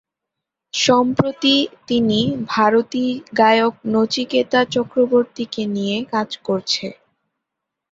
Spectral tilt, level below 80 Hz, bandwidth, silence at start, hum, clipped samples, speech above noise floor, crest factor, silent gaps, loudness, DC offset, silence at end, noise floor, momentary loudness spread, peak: -4.5 dB/octave; -58 dBFS; 7.8 kHz; 0.75 s; none; under 0.1%; 64 dB; 18 dB; none; -18 LUFS; under 0.1%; 1 s; -82 dBFS; 8 LU; -2 dBFS